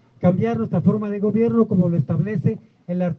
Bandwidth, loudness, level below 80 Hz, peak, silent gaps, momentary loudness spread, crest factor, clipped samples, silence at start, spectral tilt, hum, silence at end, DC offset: 3.9 kHz; -20 LUFS; -60 dBFS; -4 dBFS; none; 7 LU; 16 dB; under 0.1%; 0.2 s; -11.5 dB/octave; none; 0 s; under 0.1%